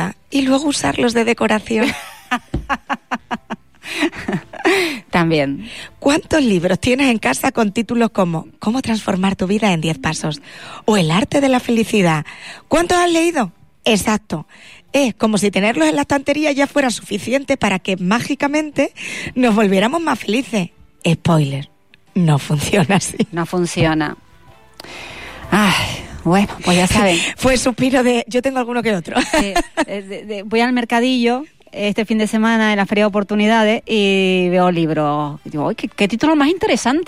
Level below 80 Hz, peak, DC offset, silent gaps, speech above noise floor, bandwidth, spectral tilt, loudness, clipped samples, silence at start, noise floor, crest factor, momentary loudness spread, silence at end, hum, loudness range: -42 dBFS; -4 dBFS; 0.5%; none; 31 dB; 15.5 kHz; -5 dB/octave; -17 LUFS; under 0.1%; 0 s; -47 dBFS; 14 dB; 10 LU; 0 s; none; 3 LU